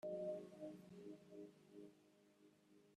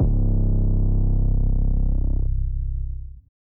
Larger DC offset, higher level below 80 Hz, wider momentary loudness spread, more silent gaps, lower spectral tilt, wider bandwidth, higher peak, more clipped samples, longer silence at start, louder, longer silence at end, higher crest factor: neither; second, under -90 dBFS vs -20 dBFS; first, 15 LU vs 9 LU; neither; second, -7.5 dB/octave vs -16.5 dB/octave; first, 13 kHz vs 1.2 kHz; second, -38 dBFS vs -10 dBFS; neither; about the same, 0.05 s vs 0 s; second, -55 LUFS vs -24 LUFS; second, 0 s vs 0.3 s; first, 16 dB vs 10 dB